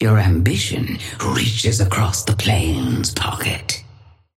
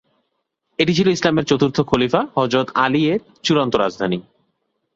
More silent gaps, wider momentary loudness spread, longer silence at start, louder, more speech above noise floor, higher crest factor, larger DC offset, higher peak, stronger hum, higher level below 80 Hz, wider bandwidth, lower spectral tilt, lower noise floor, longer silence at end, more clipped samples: neither; about the same, 7 LU vs 6 LU; second, 0 s vs 0.8 s; about the same, -19 LUFS vs -18 LUFS; second, 28 dB vs 56 dB; about the same, 16 dB vs 18 dB; neither; about the same, -4 dBFS vs -2 dBFS; neither; first, -36 dBFS vs -52 dBFS; first, 16 kHz vs 7.8 kHz; about the same, -4.5 dB/octave vs -5.5 dB/octave; second, -46 dBFS vs -73 dBFS; second, 0.55 s vs 0.75 s; neither